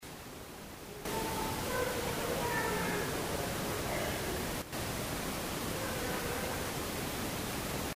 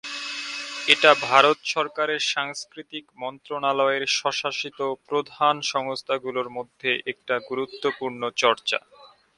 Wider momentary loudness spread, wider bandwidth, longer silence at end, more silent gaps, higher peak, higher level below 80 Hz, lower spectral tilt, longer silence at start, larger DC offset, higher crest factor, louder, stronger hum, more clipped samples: second, 7 LU vs 14 LU; first, 16 kHz vs 11.5 kHz; second, 0 s vs 0.3 s; neither; second, -20 dBFS vs 0 dBFS; first, -50 dBFS vs -72 dBFS; first, -3.5 dB/octave vs -2 dB/octave; about the same, 0 s vs 0.05 s; neither; second, 16 dB vs 24 dB; second, -36 LUFS vs -23 LUFS; neither; neither